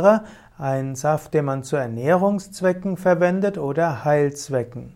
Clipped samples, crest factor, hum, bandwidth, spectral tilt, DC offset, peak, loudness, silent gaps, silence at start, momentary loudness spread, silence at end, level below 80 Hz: under 0.1%; 18 dB; none; 16 kHz; -7 dB/octave; under 0.1%; -2 dBFS; -22 LUFS; none; 0 s; 7 LU; 0.05 s; -56 dBFS